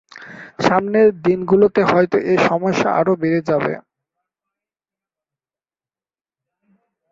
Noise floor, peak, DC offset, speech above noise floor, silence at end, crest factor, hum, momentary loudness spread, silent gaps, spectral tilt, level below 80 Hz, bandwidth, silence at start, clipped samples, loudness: under -90 dBFS; -2 dBFS; under 0.1%; over 74 dB; 3.3 s; 18 dB; none; 13 LU; none; -6.5 dB/octave; -58 dBFS; 7.6 kHz; 0.15 s; under 0.1%; -16 LUFS